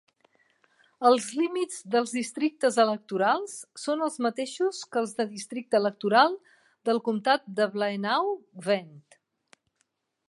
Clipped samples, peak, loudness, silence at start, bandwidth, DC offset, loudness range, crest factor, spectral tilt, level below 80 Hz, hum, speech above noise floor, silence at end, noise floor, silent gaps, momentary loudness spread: under 0.1%; -6 dBFS; -27 LUFS; 1 s; 11.5 kHz; under 0.1%; 3 LU; 20 dB; -4 dB/octave; -84 dBFS; none; 49 dB; 1.3 s; -76 dBFS; none; 9 LU